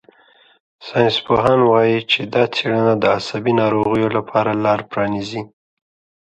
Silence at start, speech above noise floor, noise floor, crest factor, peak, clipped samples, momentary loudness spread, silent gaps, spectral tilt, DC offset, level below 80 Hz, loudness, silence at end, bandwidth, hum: 0.8 s; 36 dB; -52 dBFS; 18 dB; 0 dBFS; under 0.1%; 10 LU; none; -6.5 dB/octave; under 0.1%; -52 dBFS; -17 LUFS; 0.85 s; 8.4 kHz; none